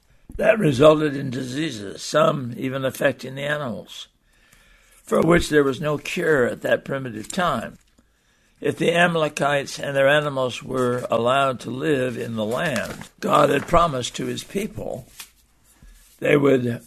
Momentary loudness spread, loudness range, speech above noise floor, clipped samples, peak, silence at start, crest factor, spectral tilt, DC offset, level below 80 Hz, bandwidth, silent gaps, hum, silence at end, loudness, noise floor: 12 LU; 4 LU; 40 dB; under 0.1%; -2 dBFS; 0.3 s; 20 dB; -5 dB/octave; under 0.1%; -44 dBFS; 13.5 kHz; none; none; 0.1 s; -21 LUFS; -61 dBFS